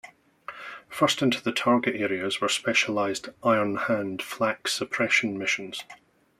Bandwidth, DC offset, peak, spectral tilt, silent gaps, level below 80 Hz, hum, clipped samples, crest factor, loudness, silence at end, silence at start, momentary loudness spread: 15.5 kHz; under 0.1%; -8 dBFS; -3.5 dB/octave; none; -70 dBFS; none; under 0.1%; 20 dB; -25 LUFS; 0.45 s; 0.05 s; 15 LU